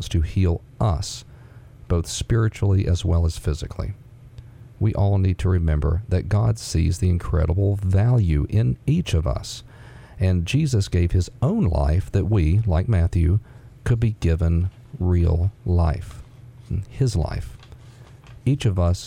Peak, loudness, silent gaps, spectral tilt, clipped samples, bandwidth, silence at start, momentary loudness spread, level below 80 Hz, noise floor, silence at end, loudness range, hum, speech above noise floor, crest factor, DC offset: -8 dBFS; -22 LUFS; none; -7 dB/octave; under 0.1%; 11.5 kHz; 0 s; 10 LU; -32 dBFS; -44 dBFS; 0 s; 3 LU; none; 24 dB; 14 dB; under 0.1%